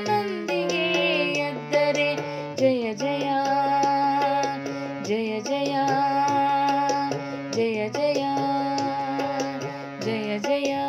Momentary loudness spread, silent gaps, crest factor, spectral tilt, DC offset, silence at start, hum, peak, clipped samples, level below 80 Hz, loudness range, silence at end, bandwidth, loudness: 7 LU; none; 14 dB; -4.5 dB/octave; under 0.1%; 0 s; none; -10 dBFS; under 0.1%; -78 dBFS; 3 LU; 0 s; 14.5 kHz; -24 LUFS